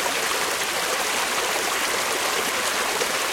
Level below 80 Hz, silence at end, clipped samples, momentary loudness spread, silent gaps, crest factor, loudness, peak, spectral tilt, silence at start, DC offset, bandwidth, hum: -58 dBFS; 0 s; under 0.1%; 1 LU; none; 16 dB; -22 LUFS; -8 dBFS; 0 dB/octave; 0 s; under 0.1%; 16.5 kHz; none